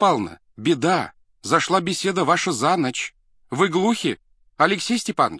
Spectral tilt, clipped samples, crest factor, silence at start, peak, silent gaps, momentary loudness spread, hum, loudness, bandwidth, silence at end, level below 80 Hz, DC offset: -4 dB/octave; under 0.1%; 20 dB; 0 s; -2 dBFS; none; 13 LU; none; -21 LUFS; 11 kHz; 0 s; -62 dBFS; under 0.1%